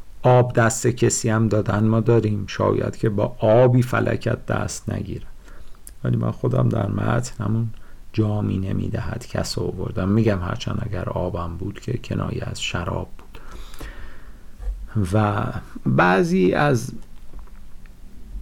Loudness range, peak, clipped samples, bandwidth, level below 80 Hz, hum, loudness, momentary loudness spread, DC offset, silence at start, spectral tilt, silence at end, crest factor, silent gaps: 8 LU; -8 dBFS; under 0.1%; 15 kHz; -38 dBFS; none; -22 LUFS; 16 LU; under 0.1%; 0 s; -6 dB/octave; 0 s; 12 dB; none